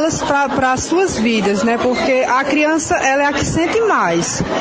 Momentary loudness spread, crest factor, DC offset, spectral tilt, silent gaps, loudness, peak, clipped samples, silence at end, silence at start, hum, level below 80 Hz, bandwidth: 2 LU; 14 dB; under 0.1%; -4 dB/octave; none; -15 LUFS; -2 dBFS; under 0.1%; 0 s; 0 s; none; -40 dBFS; 9.8 kHz